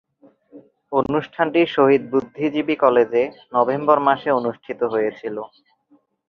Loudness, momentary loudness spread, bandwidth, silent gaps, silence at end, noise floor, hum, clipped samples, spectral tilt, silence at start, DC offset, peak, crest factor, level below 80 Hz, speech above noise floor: -20 LUFS; 10 LU; 6.2 kHz; none; 0.85 s; -60 dBFS; none; under 0.1%; -8 dB/octave; 0.55 s; under 0.1%; -2 dBFS; 18 dB; -60 dBFS; 40 dB